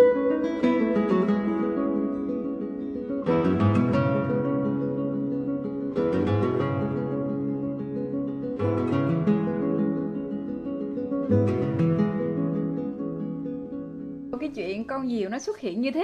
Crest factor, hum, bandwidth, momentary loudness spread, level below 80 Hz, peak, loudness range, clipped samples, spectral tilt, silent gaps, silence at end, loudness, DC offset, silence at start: 18 dB; none; 7.8 kHz; 9 LU; -58 dBFS; -8 dBFS; 3 LU; under 0.1%; -8.5 dB/octave; none; 0 s; -26 LUFS; under 0.1%; 0 s